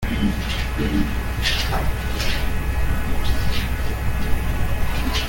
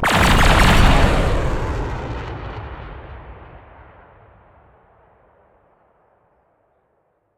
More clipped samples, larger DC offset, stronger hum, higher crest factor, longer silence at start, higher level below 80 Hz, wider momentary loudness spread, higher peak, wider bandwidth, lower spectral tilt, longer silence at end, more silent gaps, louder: neither; neither; neither; second, 14 dB vs 20 dB; about the same, 0 s vs 0 s; about the same, -24 dBFS vs -24 dBFS; second, 3 LU vs 25 LU; second, -6 dBFS vs 0 dBFS; about the same, 17 kHz vs 16.5 kHz; about the same, -5 dB/octave vs -5 dB/octave; second, 0 s vs 3.95 s; neither; second, -24 LUFS vs -17 LUFS